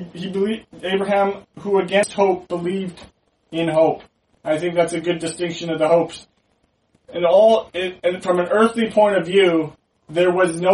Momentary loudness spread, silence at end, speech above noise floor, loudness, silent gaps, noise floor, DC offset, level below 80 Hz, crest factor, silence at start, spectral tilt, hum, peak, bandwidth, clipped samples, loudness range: 12 LU; 0 s; 46 dB; -19 LUFS; none; -65 dBFS; under 0.1%; -60 dBFS; 16 dB; 0 s; -5 dB/octave; none; -2 dBFS; 11.5 kHz; under 0.1%; 5 LU